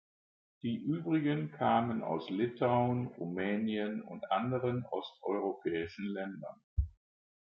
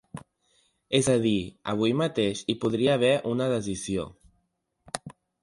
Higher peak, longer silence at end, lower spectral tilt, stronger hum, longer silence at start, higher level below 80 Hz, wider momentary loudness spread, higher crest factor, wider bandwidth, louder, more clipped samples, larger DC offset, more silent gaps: second, -16 dBFS vs -6 dBFS; first, 0.55 s vs 0.3 s; first, -9 dB/octave vs -5 dB/octave; neither; first, 0.65 s vs 0.15 s; about the same, -52 dBFS vs -56 dBFS; second, 10 LU vs 15 LU; about the same, 18 dB vs 20 dB; second, 6 kHz vs 11.5 kHz; second, -35 LUFS vs -26 LUFS; neither; neither; first, 6.64-6.76 s vs none